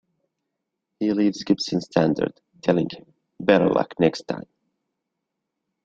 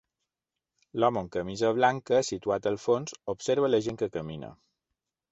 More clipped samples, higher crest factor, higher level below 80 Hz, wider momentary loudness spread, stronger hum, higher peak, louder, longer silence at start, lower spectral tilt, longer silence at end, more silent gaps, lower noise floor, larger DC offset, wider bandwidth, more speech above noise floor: neither; about the same, 22 dB vs 20 dB; about the same, -60 dBFS vs -62 dBFS; about the same, 12 LU vs 13 LU; neither; first, -2 dBFS vs -8 dBFS; first, -23 LUFS vs -28 LUFS; about the same, 1 s vs 0.95 s; first, -6.5 dB/octave vs -5 dB/octave; first, 1.45 s vs 0.8 s; neither; second, -81 dBFS vs -89 dBFS; neither; about the same, 7.8 kHz vs 8.2 kHz; about the same, 60 dB vs 61 dB